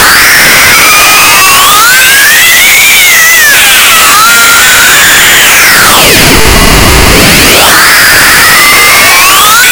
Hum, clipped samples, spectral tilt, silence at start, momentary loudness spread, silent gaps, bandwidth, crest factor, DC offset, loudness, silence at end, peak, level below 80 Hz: none; 40%; -1 dB/octave; 0 s; 1 LU; none; over 20 kHz; 2 dB; under 0.1%; 1 LUFS; 0 s; 0 dBFS; -18 dBFS